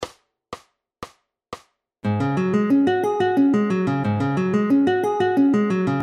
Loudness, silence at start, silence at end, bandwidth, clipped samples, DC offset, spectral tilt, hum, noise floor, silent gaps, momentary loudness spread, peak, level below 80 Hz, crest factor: -20 LUFS; 0 s; 0 s; 9.8 kHz; under 0.1%; under 0.1%; -8 dB/octave; none; -49 dBFS; none; 22 LU; -8 dBFS; -60 dBFS; 12 dB